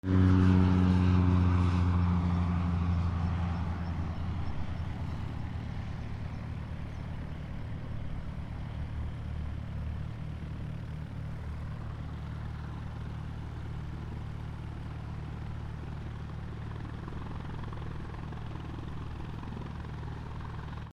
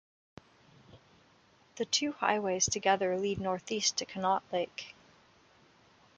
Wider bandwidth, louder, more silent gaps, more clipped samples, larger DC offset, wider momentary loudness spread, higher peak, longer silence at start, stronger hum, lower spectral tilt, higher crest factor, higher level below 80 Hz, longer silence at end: second, 6.8 kHz vs 10 kHz; second, -34 LUFS vs -31 LUFS; neither; neither; neither; first, 15 LU vs 10 LU; about the same, -14 dBFS vs -12 dBFS; second, 0.05 s vs 0.95 s; neither; first, -8.5 dB/octave vs -2.5 dB/octave; about the same, 18 dB vs 22 dB; first, -44 dBFS vs -66 dBFS; second, 0 s vs 1.25 s